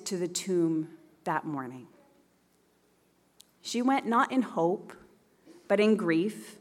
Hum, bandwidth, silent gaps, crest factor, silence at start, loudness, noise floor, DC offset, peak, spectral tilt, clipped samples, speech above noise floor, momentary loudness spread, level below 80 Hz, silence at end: none; 15.5 kHz; none; 18 dB; 0 s; -29 LUFS; -68 dBFS; under 0.1%; -12 dBFS; -5 dB/octave; under 0.1%; 39 dB; 17 LU; -80 dBFS; 0.05 s